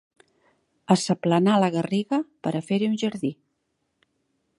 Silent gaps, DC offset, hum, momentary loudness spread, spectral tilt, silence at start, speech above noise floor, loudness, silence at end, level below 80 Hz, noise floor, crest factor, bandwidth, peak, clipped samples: none; under 0.1%; none; 9 LU; -6 dB/octave; 0.9 s; 52 dB; -24 LUFS; 1.25 s; -72 dBFS; -75 dBFS; 22 dB; 11.5 kHz; -4 dBFS; under 0.1%